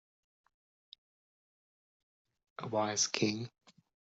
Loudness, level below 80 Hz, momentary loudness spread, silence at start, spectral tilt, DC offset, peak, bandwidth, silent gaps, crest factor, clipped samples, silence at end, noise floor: -33 LUFS; -82 dBFS; 17 LU; 2.6 s; -3.5 dB/octave; under 0.1%; -14 dBFS; 8 kHz; none; 26 dB; under 0.1%; 0.7 s; under -90 dBFS